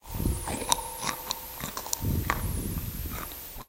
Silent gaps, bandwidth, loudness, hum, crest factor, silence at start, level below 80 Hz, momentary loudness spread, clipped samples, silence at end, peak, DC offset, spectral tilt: none; 17 kHz; -31 LUFS; none; 32 dB; 0.05 s; -38 dBFS; 8 LU; under 0.1%; 0.05 s; 0 dBFS; under 0.1%; -3.5 dB/octave